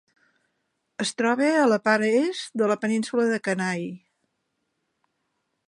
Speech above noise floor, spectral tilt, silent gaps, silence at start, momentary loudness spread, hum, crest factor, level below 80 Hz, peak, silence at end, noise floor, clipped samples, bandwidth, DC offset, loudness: 54 dB; -4.5 dB/octave; none; 1 s; 10 LU; none; 20 dB; -78 dBFS; -6 dBFS; 1.7 s; -77 dBFS; under 0.1%; 11 kHz; under 0.1%; -23 LUFS